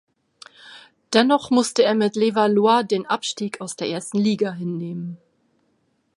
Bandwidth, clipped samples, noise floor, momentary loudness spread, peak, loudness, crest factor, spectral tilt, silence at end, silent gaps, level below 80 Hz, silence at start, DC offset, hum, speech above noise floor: 11.5 kHz; under 0.1%; -67 dBFS; 11 LU; -2 dBFS; -21 LUFS; 20 dB; -4.5 dB/octave; 1 s; none; -70 dBFS; 0.65 s; under 0.1%; none; 47 dB